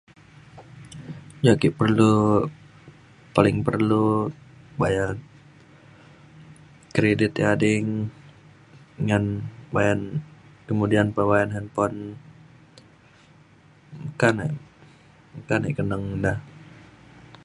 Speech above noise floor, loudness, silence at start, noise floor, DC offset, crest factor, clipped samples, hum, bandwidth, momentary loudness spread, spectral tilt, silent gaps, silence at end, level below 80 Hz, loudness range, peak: 32 dB; -23 LUFS; 0.55 s; -53 dBFS; under 0.1%; 24 dB; under 0.1%; none; 11.5 kHz; 19 LU; -7 dB/octave; none; 0.8 s; -50 dBFS; 7 LU; -2 dBFS